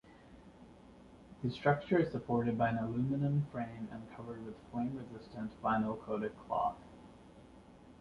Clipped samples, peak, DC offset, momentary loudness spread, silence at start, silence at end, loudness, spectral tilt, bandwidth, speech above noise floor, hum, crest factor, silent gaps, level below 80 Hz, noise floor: under 0.1%; -16 dBFS; under 0.1%; 24 LU; 0.05 s; 0.05 s; -36 LUFS; -9 dB/octave; 10.5 kHz; 22 dB; none; 20 dB; none; -62 dBFS; -58 dBFS